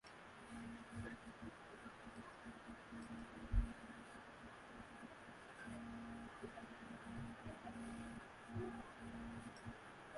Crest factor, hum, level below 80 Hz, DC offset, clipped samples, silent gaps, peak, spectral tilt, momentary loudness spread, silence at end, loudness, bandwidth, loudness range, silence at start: 24 dB; none; -56 dBFS; under 0.1%; under 0.1%; none; -26 dBFS; -6 dB/octave; 8 LU; 0 s; -53 LUFS; 11.5 kHz; 3 LU; 0.05 s